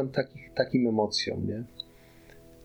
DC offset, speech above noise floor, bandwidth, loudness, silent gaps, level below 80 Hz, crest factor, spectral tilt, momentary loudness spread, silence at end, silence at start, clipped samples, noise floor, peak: under 0.1%; 25 dB; 20 kHz; -29 LUFS; none; -60 dBFS; 20 dB; -5.5 dB/octave; 16 LU; 0 s; 0 s; under 0.1%; -54 dBFS; -10 dBFS